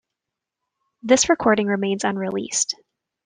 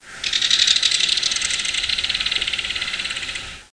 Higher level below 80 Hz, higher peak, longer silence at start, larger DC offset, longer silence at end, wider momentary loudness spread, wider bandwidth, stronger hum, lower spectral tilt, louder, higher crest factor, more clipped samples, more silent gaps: second, -58 dBFS vs -48 dBFS; about the same, -2 dBFS vs 0 dBFS; first, 1.05 s vs 0 s; second, under 0.1% vs 0.2%; first, 0.5 s vs 0.1 s; about the same, 9 LU vs 10 LU; about the same, 10.5 kHz vs 10.5 kHz; neither; first, -3 dB/octave vs 1.5 dB/octave; about the same, -20 LUFS vs -18 LUFS; about the same, 20 dB vs 22 dB; neither; neither